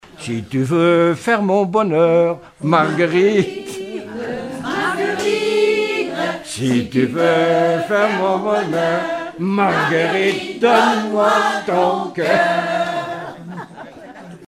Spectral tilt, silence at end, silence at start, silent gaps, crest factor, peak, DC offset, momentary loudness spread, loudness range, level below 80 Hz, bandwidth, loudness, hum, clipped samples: -5.5 dB/octave; 0.05 s; 0.2 s; none; 16 dB; -2 dBFS; under 0.1%; 13 LU; 3 LU; -58 dBFS; 15 kHz; -17 LUFS; none; under 0.1%